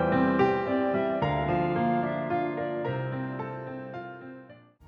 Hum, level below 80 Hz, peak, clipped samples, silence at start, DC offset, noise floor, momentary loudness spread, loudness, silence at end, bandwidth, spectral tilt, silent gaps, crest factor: none; -52 dBFS; -12 dBFS; under 0.1%; 0 s; under 0.1%; -51 dBFS; 15 LU; -28 LUFS; 0.3 s; 6.6 kHz; -9 dB/octave; none; 16 dB